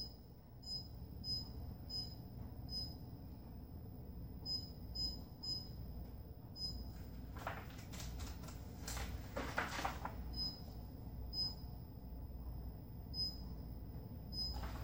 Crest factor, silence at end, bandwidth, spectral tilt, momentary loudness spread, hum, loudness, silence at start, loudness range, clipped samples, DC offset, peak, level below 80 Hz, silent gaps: 24 dB; 0 s; 16 kHz; -4 dB/octave; 11 LU; none; -46 LUFS; 0 s; 3 LU; under 0.1%; under 0.1%; -22 dBFS; -52 dBFS; none